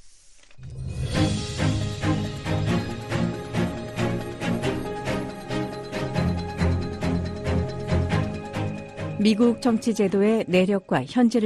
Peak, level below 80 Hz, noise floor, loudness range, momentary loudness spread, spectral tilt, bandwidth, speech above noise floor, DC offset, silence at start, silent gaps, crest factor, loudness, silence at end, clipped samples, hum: -6 dBFS; -40 dBFS; -48 dBFS; 5 LU; 10 LU; -6.5 dB/octave; 13 kHz; 28 dB; under 0.1%; 0.05 s; none; 18 dB; -25 LUFS; 0 s; under 0.1%; none